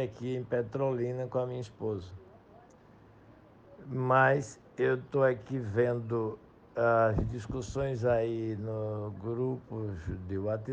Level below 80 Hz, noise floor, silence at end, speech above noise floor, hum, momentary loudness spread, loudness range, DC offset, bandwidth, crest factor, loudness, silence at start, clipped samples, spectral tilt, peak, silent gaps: -52 dBFS; -57 dBFS; 0 s; 26 dB; none; 12 LU; 6 LU; under 0.1%; 9.2 kHz; 20 dB; -32 LUFS; 0 s; under 0.1%; -7.5 dB/octave; -12 dBFS; none